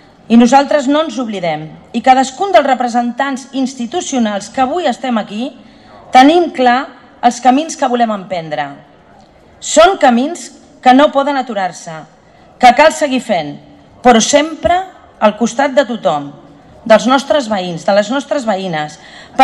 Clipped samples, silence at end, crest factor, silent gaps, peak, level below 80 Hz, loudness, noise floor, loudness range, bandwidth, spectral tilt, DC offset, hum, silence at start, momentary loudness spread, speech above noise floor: 0.2%; 0 s; 12 dB; none; 0 dBFS; -46 dBFS; -12 LUFS; -43 dBFS; 3 LU; 12 kHz; -3.5 dB/octave; under 0.1%; none; 0.3 s; 15 LU; 31 dB